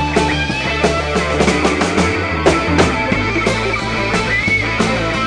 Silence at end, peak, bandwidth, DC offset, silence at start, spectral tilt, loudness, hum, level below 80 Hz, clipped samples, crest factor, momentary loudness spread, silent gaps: 0 s; -2 dBFS; 10 kHz; 0.4%; 0 s; -4.5 dB/octave; -15 LUFS; none; -28 dBFS; under 0.1%; 14 dB; 3 LU; none